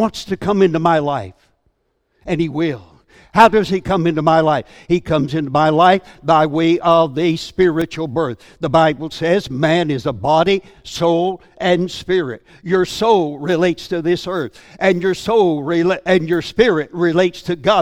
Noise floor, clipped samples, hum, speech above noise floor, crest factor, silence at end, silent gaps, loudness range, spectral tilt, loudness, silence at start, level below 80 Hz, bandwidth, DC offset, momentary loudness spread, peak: -65 dBFS; under 0.1%; none; 50 dB; 16 dB; 0 s; none; 3 LU; -6 dB/octave; -16 LUFS; 0 s; -46 dBFS; 15 kHz; under 0.1%; 8 LU; 0 dBFS